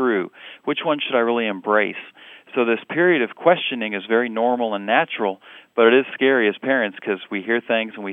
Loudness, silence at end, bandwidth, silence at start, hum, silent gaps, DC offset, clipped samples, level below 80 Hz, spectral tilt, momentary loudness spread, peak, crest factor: -20 LUFS; 0 s; 3.9 kHz; 0 s; none; none; under 0.1%; under 0.1%; -86 dBFS; -7.5 dB/octave; 9 LU; -2 dBFS; 18 dB